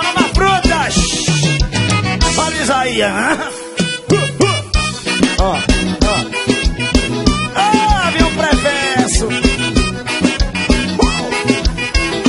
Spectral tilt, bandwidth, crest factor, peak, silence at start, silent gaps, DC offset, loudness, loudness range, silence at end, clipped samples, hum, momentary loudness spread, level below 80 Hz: -4 dB/octave; 11.5 kHz; 14 dB; 0 dBFS; 0 s; none; under 0.1%; -14 LUFS; 1 LU; 0 s; under 0.1%; none; 4 LU; -22 dBFS